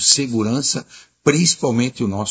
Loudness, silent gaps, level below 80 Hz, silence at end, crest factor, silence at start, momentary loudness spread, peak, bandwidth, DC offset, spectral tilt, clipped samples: -17 LUFS; none; -50 dBFS; 0 s; 18 dB; 0 s; 7 LU; 0 dBFS; 8 kHz; under 0.1%; -3.5 dB/octave; under 0.1%